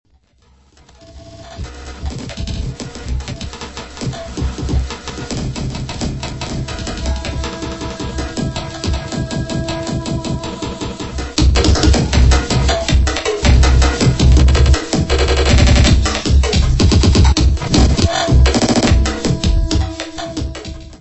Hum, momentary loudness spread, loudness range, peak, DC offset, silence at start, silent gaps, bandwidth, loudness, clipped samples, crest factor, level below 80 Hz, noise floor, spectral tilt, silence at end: none; 15 LU; 12 LU; 0 dBFS; under 0.1%; 1.1 s; none; 8.4 kHz; -16 LUFS; under 0.1%; 14 dB; -18 dBFS; -52 dBFS; -5 dB/octave; 0.05 s